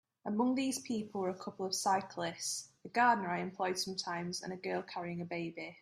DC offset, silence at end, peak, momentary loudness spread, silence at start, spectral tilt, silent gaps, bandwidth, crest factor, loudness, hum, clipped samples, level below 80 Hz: under 0.1%; 0.05 s; -18 dBFS; 10 LU; 0.25 s; -3.5 dB/octave; none; 15 kHz; 20 dB; -36 LUFS; none; under 0.1%; -80 dBFS